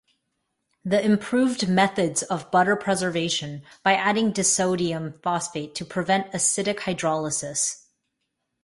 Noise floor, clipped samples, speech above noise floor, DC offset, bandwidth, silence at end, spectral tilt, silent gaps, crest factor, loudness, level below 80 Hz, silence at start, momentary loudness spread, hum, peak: -78 dBFS; under 0.1%; 55 dB; under 0.1%; 11.5 kHz; 0.9 s; -3.5 dB/octave; none; 20 dB; -23 LUFS; -62 dBFS; 0.85 s; 8 LU; none; -6 dBFS